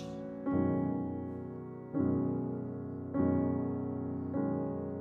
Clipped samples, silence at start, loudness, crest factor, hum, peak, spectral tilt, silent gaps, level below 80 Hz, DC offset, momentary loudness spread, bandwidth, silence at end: under 0.1%; 0 s; -35 LUFS; 16 dB; none; -18 dBFS; -10.5 dB/octave; none; -64 dBFS; under 0.1%; 10 LU; 4.2 kHz; 0 s